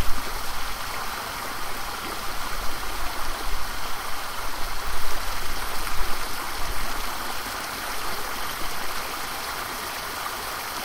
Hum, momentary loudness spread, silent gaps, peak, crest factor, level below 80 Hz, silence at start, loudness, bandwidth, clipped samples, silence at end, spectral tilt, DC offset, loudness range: none; 1 LU; none; -6 dBFS; 18 dB; -34 dBFS; 0 s; -30 LUFS; 16 kHz; under 0.1%; 0 s; -2 dB/octave; under 0.1%; 1 LU